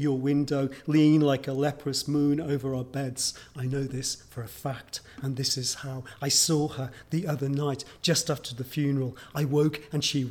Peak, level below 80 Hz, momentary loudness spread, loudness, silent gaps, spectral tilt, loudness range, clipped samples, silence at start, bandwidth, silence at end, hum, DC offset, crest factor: -12 dBFS; -58 dBFS; 13 LU; -28 LUFS; none; -4.5 dB/octave; 5 LU; under 0.1%; 0 s; 19 kHz; 0 s; none; under 0.1%; 16 dB